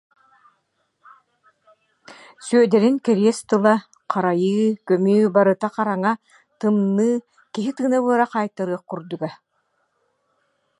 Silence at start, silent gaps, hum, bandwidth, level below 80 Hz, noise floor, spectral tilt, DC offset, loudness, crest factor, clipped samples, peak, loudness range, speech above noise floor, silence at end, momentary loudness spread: 2.1 s; none; none; 11.5 kHz; -74 dBFS; -70 dBFS; -6.5 dB/octave; under 0.1%; -20 LUFS; 20 dB; under 0.1%; -2 dBFS; 5 LU; 51 dB; 1.45 s; 13 LU